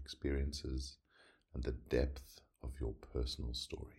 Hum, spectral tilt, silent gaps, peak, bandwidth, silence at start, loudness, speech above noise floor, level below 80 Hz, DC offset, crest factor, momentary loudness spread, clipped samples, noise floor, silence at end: none; -5.5 dB/octave; none; -22 dBFS; 13.5 kHz; 0 s; -42 LUFS; 28 dB; -44 dBFS; under 0.1%; 20 dB; 14 LU; under 0.1%; -69 dBFS; 0.05 s